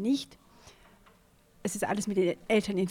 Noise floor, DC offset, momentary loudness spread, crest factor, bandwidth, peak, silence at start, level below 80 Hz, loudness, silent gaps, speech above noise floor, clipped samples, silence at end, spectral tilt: -62 dBFS; under 0.1%; 10 LU; 16 dB; 17 kHz; -16 dBFS; 0 s; -64 dBFS; -30 LUFS; none; 33 dB; under 0.1%; 0 s; -5 dB/octave